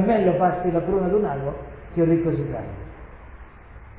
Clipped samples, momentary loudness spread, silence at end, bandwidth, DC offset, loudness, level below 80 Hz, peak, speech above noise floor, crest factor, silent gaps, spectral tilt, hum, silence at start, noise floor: under 0.1%; 19 LU; 0 s; 4 kHz; under 0.1%; -23 LUFS; -42 dBFS; -8 dBFS; 22 dB; 16 dB; none; -12.5 dB/octave; none; 0 s; -43 dBFS